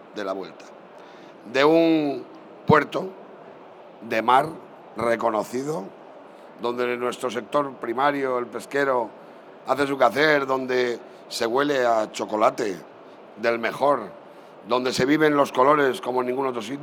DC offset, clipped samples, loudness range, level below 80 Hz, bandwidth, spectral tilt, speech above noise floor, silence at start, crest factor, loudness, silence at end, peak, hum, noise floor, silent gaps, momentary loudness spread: under 0.1%; under 0.1%; 4 LU; -70 dBFS; 19.5 kHz; -5 dB/octave; 22 dB; 0 s; 20 dB; -23 LUFS; 0 s; -4 dBFS; none; -45 dBFS; none; 16 LU